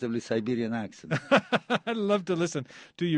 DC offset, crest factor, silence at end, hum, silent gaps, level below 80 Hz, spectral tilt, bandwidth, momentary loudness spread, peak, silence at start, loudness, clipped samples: under 0.1%; 20 dB; 0 s; none; none; -70 dBFS; -5.5 dB/octave; 10 kHz; 9 LU; -8 dBFS; 0 s; -28 LUFS; under 0.1%